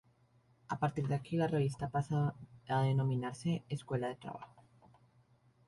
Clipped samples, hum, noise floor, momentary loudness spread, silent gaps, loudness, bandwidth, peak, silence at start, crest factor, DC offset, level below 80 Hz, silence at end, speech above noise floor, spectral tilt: under 0.1%; none; -70 dBFS; 14 LU; none; -36 LUFS; 11.5 kHz; -20 dBFS; 0.7 s; 16 dB; under 0.1%; -66 dBFS; 1.2 s; 34 dB; -7.5 dB/octave